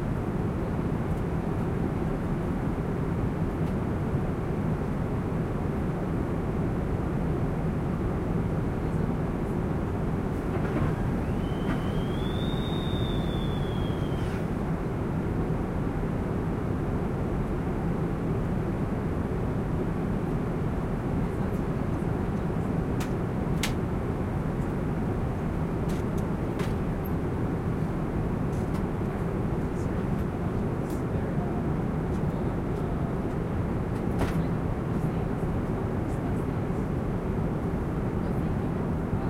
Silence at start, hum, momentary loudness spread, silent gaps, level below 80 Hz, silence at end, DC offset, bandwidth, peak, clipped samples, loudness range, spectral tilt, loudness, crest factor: 0 s; none; 1 LU; none; -36 dBFS; 0 s; under 0.1%; 15.5 kHz; -14 dBFS; under 0.1%; 1 LU; -8 dB/octave; -29 LUFS; 14 dB